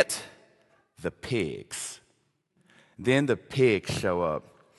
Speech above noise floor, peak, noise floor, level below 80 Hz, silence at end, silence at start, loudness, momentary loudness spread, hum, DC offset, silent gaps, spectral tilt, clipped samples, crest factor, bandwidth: 44 dB; -6 dBFS; -71 dBFS; -56 dBFS; 0.4 s; 0 s; -28 LUFS; 13 LU; none; under 0.1%; none; -5 dB/octave; under 0.1%; 24 dB; 12.5 kHz